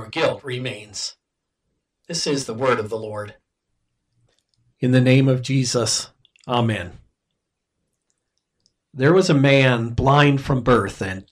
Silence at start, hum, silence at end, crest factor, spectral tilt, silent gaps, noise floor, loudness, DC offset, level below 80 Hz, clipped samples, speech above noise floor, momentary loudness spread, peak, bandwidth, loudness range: 0 s; none; 0.1 s; 18 dB; -5.5 dB/octave; none; -78 dBFS; -19 LUFS; under 0.1%; -46 dBFS; under 0.1%; 59 dB; 14 LU; -2 dBFS; 11.5 kHz; 9 LU